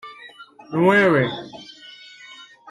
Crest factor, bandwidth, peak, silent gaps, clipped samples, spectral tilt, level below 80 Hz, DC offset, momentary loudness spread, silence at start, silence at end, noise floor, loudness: 18 dB; 12 kHz; -4 dBFS; none; under 0.1%; -7 dB/octave; -62 dBFS; under 0.1%; 25 LU; 0.05 s; 0 s; -44 dBFS; -18 LUFS